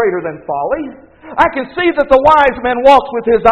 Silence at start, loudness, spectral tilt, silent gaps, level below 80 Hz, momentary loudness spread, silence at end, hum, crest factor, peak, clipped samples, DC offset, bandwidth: 0 s; -12 LUFS; -6 dB/octave; none; -38 dBFS; 13 LU; 0 s; none; 12 dB; 0 dBFS; 0.9%; under 0.1%; 9 kHz